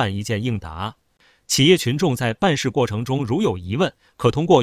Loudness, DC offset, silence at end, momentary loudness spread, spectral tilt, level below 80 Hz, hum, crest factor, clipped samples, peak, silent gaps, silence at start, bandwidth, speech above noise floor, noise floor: -20 LUFS; under 0.1%; 0 s; 11 LU; -5 dB/octave; -44 dBFS; none; 20 dB; under 0.1%; 0 dBFS; none; 0 s; 16 kHz; 33 dB; -52 dBFS